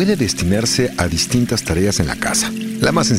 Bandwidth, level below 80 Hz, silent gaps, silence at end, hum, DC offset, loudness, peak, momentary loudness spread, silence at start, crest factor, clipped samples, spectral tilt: 16 kHz; -34 dBFS; none; 0 s; none; under 0.1%; -17 LUFS; 0 dBFS; 2 LU; 0 s; 16 dB; under 0.1%; -4 dB/octave